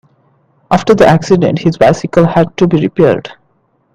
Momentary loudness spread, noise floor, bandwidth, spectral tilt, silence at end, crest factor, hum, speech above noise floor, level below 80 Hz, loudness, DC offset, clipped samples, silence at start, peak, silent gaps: 6 LU; -57 dBFS; 9.8 kHz; -7 dB/octave; 0.65 s; 10 dB; none; 47 dB; -40 dBFS; -10 LUFS; under 0.1%; 0.4%; 0.7 s; 0 dBFS; none